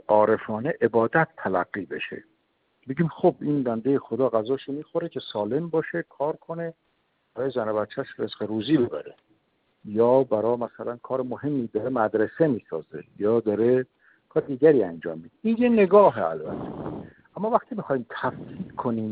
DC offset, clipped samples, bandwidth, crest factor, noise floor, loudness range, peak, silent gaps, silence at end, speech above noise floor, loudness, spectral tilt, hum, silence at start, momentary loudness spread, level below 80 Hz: under 0.1%; under 0.1%; 4.9 kHz; 20 dB; -70 dBFS; 7 LU; -4 dBFS; none; 0 s; 46 dB; -25 LUFS; -6 dB/octave; none; 0.1 s; 15 LU; -64 dBFS